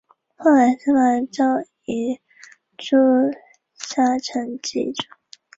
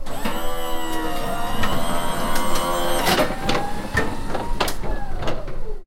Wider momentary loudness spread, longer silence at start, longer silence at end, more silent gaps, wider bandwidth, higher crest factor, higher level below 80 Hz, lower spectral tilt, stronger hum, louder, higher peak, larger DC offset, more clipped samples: first, 16 LU vs 9 LU; first, 0.4 s vs 0 s; first, 0.55 s vs 0 s; neither; second, 7.8 kHz vs 16.5 kHz; about the same, 16 dB vs 16 dB; second, -64 dBFS vs -28 dBFS; about the same, -4 dB/octave vs -4 dB/octave; neither; first, -20 LUFS vs -24 LUFS; about the same, -4 dBFS vs -4 dBFS; neither; neither